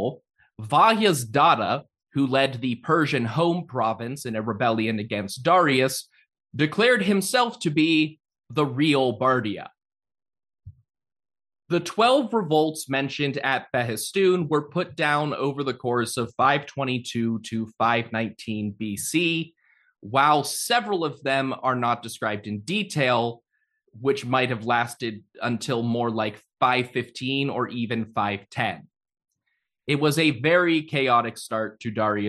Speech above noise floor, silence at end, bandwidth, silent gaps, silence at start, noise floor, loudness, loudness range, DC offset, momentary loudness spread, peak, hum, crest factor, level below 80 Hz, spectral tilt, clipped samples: 54 dB; 0 s; 12.5 kHz; none; 0 s; -77 dBFS; -24 LUFS; 4 LU; under 0.1%; 10 LU; -4 dBFS; none; 20 dB; -68 dBFS; -5 dB/octave; under 0.1%